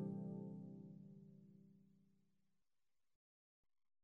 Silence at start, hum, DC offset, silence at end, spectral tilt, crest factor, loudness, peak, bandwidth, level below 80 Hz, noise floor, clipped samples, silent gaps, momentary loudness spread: 0 s; none; under 0.1%; 2 s; -12.5 dB/octave; 18 dB; -54 LUFS; -38 dBFS; 1.7 kHz; under -90 dBFS; under -90 dBFS; under 0.1%; none; 17 LU